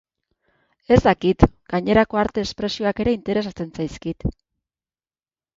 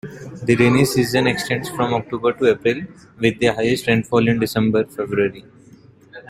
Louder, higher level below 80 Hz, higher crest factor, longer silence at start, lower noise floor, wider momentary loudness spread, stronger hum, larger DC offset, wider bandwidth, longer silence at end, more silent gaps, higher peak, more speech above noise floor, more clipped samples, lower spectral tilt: about the same, -21 LUFS vs -19 LUFS; first, -36 dBFS vs -50 dBFS; about the same, 22 dB vs 18 dB; first, 0.9 s vs 0.05 s; first, under -90 dBFS vs -47 dBFS; first, 12 LU vs 7 LU; neither; neither; second, 7.6 kHz vs 16 kHz; first, 1.25 s vs 0.1 s; neither; about the same, 0 dBFS vs -2 dBFS; first, over 70 dB vs 29 dB; neither; first, -7 dB/octave vs -5.5 dB/octave